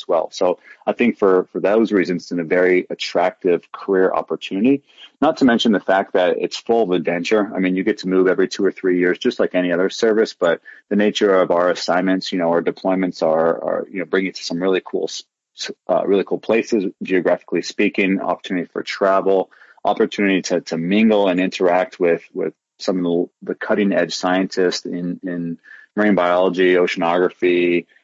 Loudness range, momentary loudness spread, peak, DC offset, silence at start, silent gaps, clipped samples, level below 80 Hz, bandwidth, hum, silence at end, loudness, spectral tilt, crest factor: 3 LU; 9 LU; -4 dBFS; under 0.1%; 0.1 s; none; under 0.1%; -66 dBFS; 7.8 kHz; none; 0.2 s; -18 LUFS; -5.5 dB/octave; 14 dB